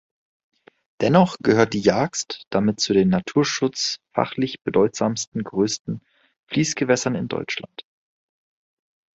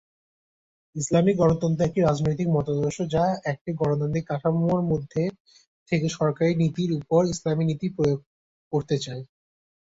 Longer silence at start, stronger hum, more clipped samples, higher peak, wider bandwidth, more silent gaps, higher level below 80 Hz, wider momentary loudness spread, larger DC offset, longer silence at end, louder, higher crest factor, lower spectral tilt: about the same, 1 s vs 0.95 s; neither; neither; first, -2 dBFS vs -8 dBFS; about the same, 8.2 kHz vs 8 kHz; second, 2.47-2.51 s, 5.27-5.32 s, 5.80-5.85 s, 6.39-6.47 s vs 3.61-3.65 s, 5.40-5.45 s, 5.67-5.86 s, 8.26-8.71 s; about the same, -56 dBFS vs -52 dBFS; about the same, 10 LU vs 8 LU; neither; first, 1.35 s vs 0.75 s; first, -21 LUFS vs -25 LUFS; about the same, 20 dB vs 16 dB; second, -5 dB/octave vs -7 dB/octave